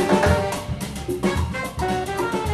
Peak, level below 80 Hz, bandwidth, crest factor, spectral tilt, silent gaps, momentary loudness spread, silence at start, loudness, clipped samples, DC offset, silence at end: -6 dBFS; -34 dBFS; 15 kHz; 16 dB; -5.5 dB/octave; none; 10 LU; 0 s; -23 LUFS; under 0.1%; 0.1%; 0 s